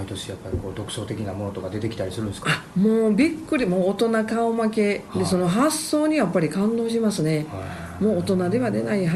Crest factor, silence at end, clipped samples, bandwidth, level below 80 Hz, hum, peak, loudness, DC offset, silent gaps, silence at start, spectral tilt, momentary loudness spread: 16 dB; 0 s; under 0.1%; 14 kHz; -50 dBFS; none; -6 dBFS; -23 LUFS; under 0.1%; none; 0 s; -6 dB/octave; 10 LU